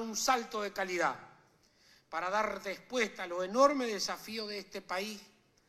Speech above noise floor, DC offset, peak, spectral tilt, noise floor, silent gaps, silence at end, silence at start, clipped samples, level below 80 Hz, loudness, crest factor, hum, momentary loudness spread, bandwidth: 33 dB; under 0.1%; -14 dBFS; -2.5 dB/octave; -66 dBFS; none; 0.45 s; 0 s; under 0.1%; -70 dBFS; -34 LUFS; 22 dB; none; 13 LU; 15.5 kHz